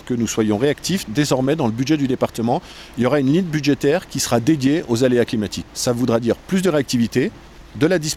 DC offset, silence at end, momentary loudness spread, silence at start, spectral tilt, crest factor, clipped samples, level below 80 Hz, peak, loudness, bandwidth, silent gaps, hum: under 0.1%; 0 s; 5 LU; 0.05 s; -5.5 dB/octave; 16 dB; under 0.1%; -46 dBFS; -4 dBFS; -19 LUFS; 16.5 kHz; none; none